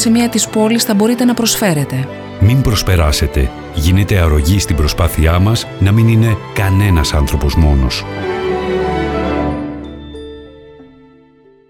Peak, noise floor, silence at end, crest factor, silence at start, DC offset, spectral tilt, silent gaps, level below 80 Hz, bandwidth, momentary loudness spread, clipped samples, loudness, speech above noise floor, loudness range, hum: -2 dBFS; -46 dBFS; 0.85 s; 12 dB; 0 s; under 0.1%; -5.5 dB/octave; none; -22 dBFS; 18.5 kHz; 9 LU; under 0.1%; -13 LUFS; 34 dB; 6 LU; none